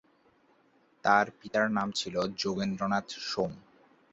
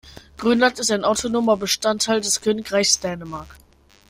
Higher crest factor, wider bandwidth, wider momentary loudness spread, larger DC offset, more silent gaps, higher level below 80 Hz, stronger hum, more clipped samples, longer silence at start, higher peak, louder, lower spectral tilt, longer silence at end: about the same, 22 dB vs 20 dB; second, 8.2 kHz vs 16 kHz; about the same, 8 LU vs 10 LU; neither; neither; second, -66 dBFS vs -52 dBFS; neither; neither; first, 1.05 s vs 0.05 s; second, -10 dBFS vs -2 dBFS; second, -30 LUFS vs -20 LUFS; first, -4.5 dB/octave vs -2.5 dB/octave; about the same, 0.55 s vs 0.55 s